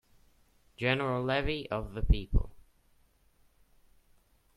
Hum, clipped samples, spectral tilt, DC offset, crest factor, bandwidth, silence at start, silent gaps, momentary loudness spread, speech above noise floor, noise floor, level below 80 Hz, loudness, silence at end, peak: none; under 0.1%; -7.5 dB/octave; under 0.1%; 24 dB; 11.5 kHz; 0.8 s; none; 6 LU; 37 dB; -67 dBFS; -38 dBFS; -32 LUFS; 1.95 s; -10 dBFS